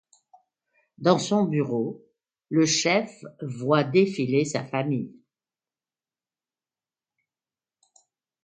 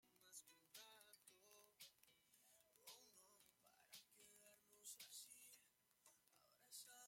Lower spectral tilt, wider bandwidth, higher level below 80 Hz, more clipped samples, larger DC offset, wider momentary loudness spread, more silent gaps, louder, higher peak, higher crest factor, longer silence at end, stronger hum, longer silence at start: first, -5 dB/octave vs 1 dB/octave; second, 9.4 kHz vs 16.5 kHz; first, -72 dBFS vs under -90 dBFS; neither; neither; first, 15 LU vs 9 LU; neither; first, -24 LUFS vs -63 LUFS; first, -4 dBFS vs -46 dBFS; about the same, 22 dB vs 22 dB; first, 3.35 s vs 0 s; neither; first, 1 s vs 0 s